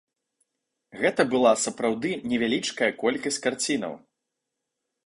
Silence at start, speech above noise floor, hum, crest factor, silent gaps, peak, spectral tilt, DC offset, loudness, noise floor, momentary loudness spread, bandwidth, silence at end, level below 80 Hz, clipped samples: 0.95 s; 58 dB; none; 20 dB; none; -8 dBFS; -3 dB/octave; under 0.1%; -25 LUFS; -83 dBFS; 8 LU; 11.5 kHz; 1.1 s; -66 dBFS; under 0.1%